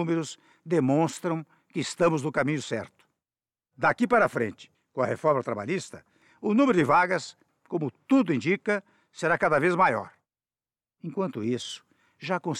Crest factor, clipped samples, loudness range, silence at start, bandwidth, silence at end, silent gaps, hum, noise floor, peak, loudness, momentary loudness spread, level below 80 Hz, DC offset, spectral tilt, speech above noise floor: 16 dB; under 0.1%; 3 LU; 0 s; 12.5 kHz; 0 s; none; none; under -90 dBFS; -12 dBFS; -26 LUFS; 15 LU; -68 dBFS; under 0.1%; -6 dB/octave; over 64 dB